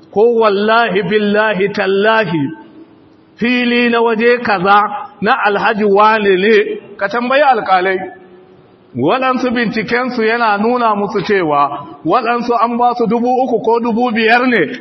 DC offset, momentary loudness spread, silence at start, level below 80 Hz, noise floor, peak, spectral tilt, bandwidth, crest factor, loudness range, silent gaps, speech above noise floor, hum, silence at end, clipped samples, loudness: under 0.1%; 7 LU; 0.15 s; -58 dBFS; -44 dBFS; 0 dBFS; -6.5 dB/octave; 6.2 kHz; 14 dB; 3 LU; none; 32 dB; none; 0 s; under 0.1%; -13 LUFS